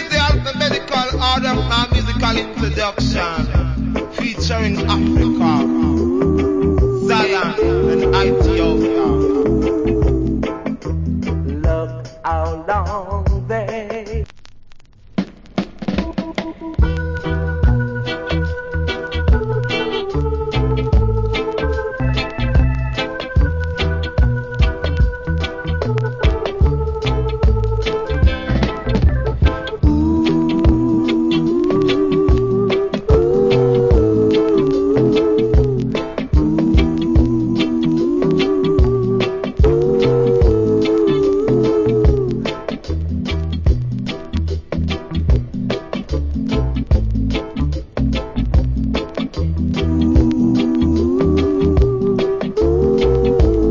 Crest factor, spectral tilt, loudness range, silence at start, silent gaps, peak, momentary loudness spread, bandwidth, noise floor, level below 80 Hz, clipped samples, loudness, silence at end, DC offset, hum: 16 dB; -7.5 dB/octave; 6 LU; 0 s; none; 0 dBFS; 8 LU; 7.6 kHz; -39 dBFS; -22 dBFS; under 0.1%; -17 LUFS; 0 s; under 0.1%; none